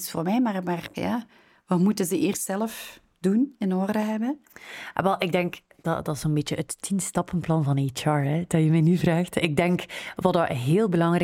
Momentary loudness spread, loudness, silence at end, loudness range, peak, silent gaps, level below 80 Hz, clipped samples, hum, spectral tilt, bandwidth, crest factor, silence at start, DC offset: 9 LU; -25 LUFS; 0 s; 4 LU; -6 dBFS; none; -56 dBFS; under 0.1%; none; -6 dB/octave; 17 kHz; 18 dB; 0 s; under 0.1%